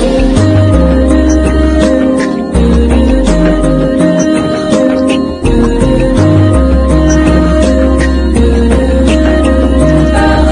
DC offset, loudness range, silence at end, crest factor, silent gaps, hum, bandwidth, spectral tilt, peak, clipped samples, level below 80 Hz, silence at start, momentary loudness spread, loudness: under 0.1%; 1 LU; 0 s; 8 dB; none; none; 10.5 kHz; -7 dB/octave; 0 dBFS; 0.6%; -12 dBFS; 0 s; 3 LU; -9 LUFS